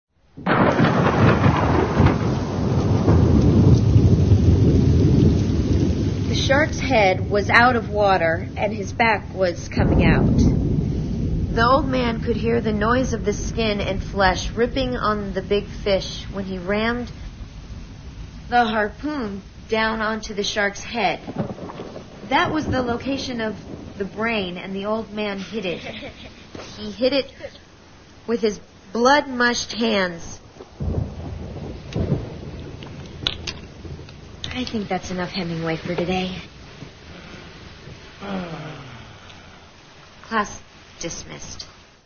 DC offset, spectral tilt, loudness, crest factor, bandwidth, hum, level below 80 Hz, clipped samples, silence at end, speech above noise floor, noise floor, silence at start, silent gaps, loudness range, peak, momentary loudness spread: 0.1%; -6 dB/octave; -21 LUFS; 22 dB; 6.8 kHz; none; -32 dBFS; under 0.1%; 0.35 s; 25 dB; -47 dBFS; 0.35 s; none; 13 LU; 0 dBFS; 21 LU